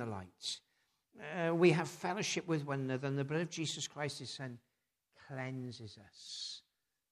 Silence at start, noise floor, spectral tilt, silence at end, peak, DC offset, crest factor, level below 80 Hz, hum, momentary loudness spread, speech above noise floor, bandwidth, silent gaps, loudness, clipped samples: 0 s; -79 dBFS; -5 dB/octave; 0.55 s; -16 dBFS; under 0.1%; 24 dB; -82 dBFS; none; 19 LU; 42 dB; 13.5 kHz; none; -38 LUFS; under 0.1%